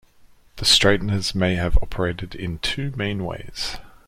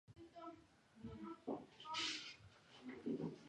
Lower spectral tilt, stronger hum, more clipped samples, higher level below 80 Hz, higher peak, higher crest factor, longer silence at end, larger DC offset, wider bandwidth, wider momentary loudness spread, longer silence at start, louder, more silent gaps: about the same, -4 dB/octave vs -3.5 dB/octave; neither; neither; first, -30 dBFS vs -76 dBFS; first, -2 dBFS vs -30 dBFS; about the same, 20 dB vs 20 dB; first, 0.15 s vs 0 s; neither; first, 16 kHz vs 11 kHz; second, 14 LU vs 18 LU; first, 0.55 s vs 0.1 s; first, -22 LUFS vs -49 LUFS; neither